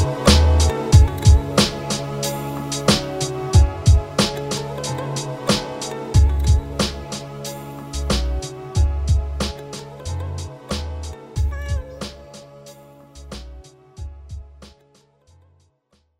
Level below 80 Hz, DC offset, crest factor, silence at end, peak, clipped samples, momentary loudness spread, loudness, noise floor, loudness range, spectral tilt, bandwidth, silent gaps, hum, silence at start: -24 dBFS; under 0.1%; 20 dB; 1.5 s; 0 dBFS; under 0.1%; 21 LU; -20 LUFS; -64 dBFS; 20 LU; -5 dB/octave; 16 kHz; none; none; 0 s